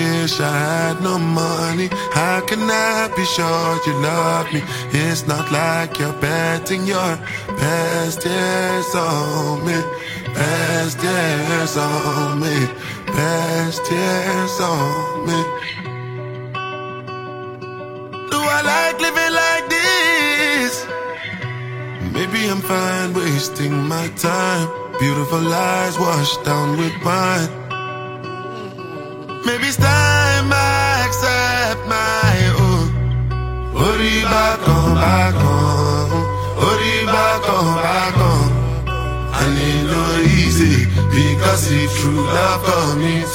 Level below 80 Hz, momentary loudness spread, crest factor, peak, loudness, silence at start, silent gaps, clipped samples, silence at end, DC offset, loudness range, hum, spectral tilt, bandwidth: -32 dBFS; 12 LU; 16 dB; 0 dBFS; -17 LUFS; 0 s; none; under 0.1%; 0 s; under 0.1%; 5 LU; none; -4.5 dB/octave; 16.5 kHz